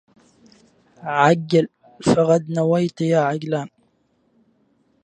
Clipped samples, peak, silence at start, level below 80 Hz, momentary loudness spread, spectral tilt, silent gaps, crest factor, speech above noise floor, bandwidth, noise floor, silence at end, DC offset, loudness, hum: under 0.1%; -2 dBFS; 1 s; -60 dBFS; 11 LU; -6.5 dB/octave; none; 20 dB; 46 dB; 10 kHz; -64 dBFS; 1.35 s; under 0.1%; -19 LUFS; none